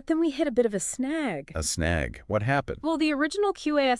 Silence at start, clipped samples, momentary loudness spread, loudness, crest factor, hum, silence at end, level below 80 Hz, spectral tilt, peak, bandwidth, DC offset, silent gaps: 0.05 s; under 0.1%; 5 LU; -27 LUFS; 16 dB; none; 0 s; -46 dBFS; -4.5 dB/octave; -10 dBFS; 12 kHz; under 0.1%; none